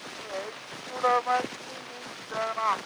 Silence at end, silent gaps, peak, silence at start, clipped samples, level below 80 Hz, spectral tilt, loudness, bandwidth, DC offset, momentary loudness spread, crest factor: 0 s; none; -12 dBFS; 0 s; under 0.1%; -74 dBFS; -2.5 dB/octave; -31 LUFS; over 20 kHz; under 0.1%; 14 LU; 18 dB